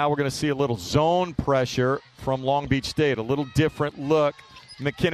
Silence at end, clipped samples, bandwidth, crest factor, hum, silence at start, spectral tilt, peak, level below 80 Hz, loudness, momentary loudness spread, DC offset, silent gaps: 0 s; under 0.1%; 14 kHz; 16 dB; none; 0 s; -6 dB/octave; -8 dBFS; -46 dBFS; -24 LUFS; 6 LU; under 0.1%; none